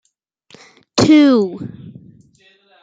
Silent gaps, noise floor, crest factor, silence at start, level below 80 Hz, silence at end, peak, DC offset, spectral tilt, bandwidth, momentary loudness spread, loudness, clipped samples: none; -56 dBFS; 16 dB; 0.95 s; -54 dBFS; 0.9 s; 0 dBFS; under 0.1%; -5.5 dB/octave; 9.2 kHz; 21 LU; -13 LUFS; under 0.1%